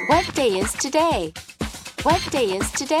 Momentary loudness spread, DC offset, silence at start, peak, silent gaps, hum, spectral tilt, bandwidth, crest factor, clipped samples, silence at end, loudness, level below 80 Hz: 12 LU; under 0.1%; 0 s; -6 dBFS; none; none; -3.5 dB/octave; 16 kHz; 16 dB; under 0.1%; 0 s; -22 LUFS; -40 dBFS